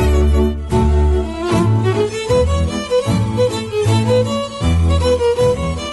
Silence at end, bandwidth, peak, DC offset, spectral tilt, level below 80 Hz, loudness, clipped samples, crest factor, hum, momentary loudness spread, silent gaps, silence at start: 0 s; 12 kHz; -4 dBFS; under 0.1%; -6.5 dB/octave; -20 dBFS; -16 LUFS; under 0.1%; 10 dB; none; 4 LU; none; 0 s